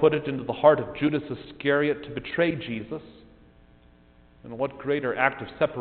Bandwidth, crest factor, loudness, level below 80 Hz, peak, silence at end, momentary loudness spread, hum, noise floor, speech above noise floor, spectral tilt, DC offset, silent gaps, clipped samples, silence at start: 4.5 kHz; 22 dB; -26 LUFS; -56 dBFS; -4 dBFS; 0 s; 14 LU; none; -55 dBFS; 30 dB; -4.5 dB/octave; under 0.1%; none; under 0.1%; 0 s